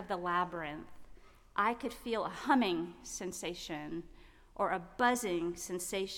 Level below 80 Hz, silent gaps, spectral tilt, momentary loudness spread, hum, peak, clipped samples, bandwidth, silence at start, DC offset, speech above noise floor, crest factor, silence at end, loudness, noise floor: -60 dBFS; none; -3.5 dB/octave; 12 LU; none; -18 dBFS; under 0.1%; 17.5 kHz; 0 s; under 0.1%; 20 dB; 20 dB; 0 s; -35 LUFS; -55 dBFS